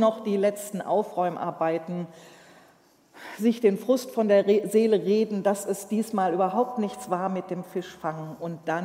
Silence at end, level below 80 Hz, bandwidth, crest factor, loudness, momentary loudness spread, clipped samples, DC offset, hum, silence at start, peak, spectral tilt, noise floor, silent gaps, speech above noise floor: 0 s; -76 dBFS; 16 kHz; 16 dB; -26 LUFS; 12 LU; under 0.1%; under 0.1%; none; 0 s; -8 dBFS; -6 dB/octave; -59 dBFS; none; 34 dB